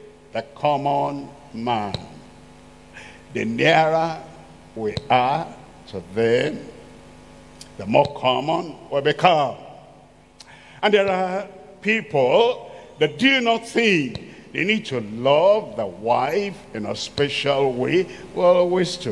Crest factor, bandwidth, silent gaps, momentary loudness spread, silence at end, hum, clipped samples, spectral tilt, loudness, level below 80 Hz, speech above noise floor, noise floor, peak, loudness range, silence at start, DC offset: 22 dB; 12 kHz; none; 18 LU; 0 s; 50 Hz at -55 dBFS; under 0.1%; -5 dB/octave; -21 LUFS; -54 dBFS; 29 dB; -49 dBFS; 0 dBFS; 5 LU; 0.05 s; 0.1%